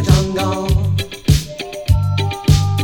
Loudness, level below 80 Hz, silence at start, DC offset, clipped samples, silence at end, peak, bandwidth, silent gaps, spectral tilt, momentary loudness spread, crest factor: -17 LUFS; -24 dBFS; 0 s; under 0.1%; under 0.1%; 0 s; 0 dBFS; 18.5 kHz; none; -6 dB/octave; 5 LU; 16 dB